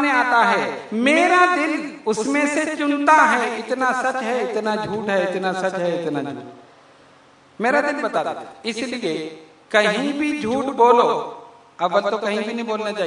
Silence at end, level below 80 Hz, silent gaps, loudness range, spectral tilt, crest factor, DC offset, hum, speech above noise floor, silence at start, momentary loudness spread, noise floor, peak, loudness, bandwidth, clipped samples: 0 s; -66 dBFS; none; 7 LU; -4 dB/octave; 20 dB; under 0.1%; none; 31 dB; 0 s; 11 LU; -51 dBFS; 0 dBFS; -20 LUFS; 11 kHz; under 0.1%